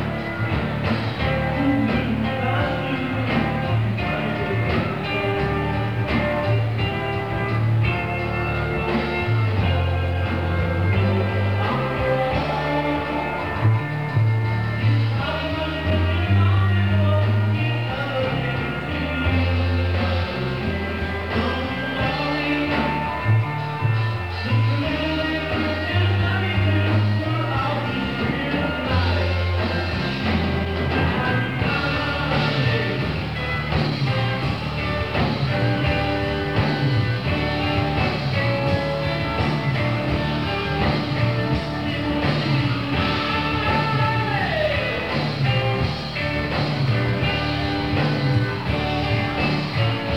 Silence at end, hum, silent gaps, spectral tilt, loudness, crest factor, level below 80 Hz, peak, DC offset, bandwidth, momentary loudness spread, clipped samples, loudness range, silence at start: 0 s; none; none; -7.5 dB/octave; -22 LUFS; 14 dB; -36 dBFS; -6 dBFS; 0.5%; 9 kHz; 4 LU; under 0.1%; 2 LU; 0 s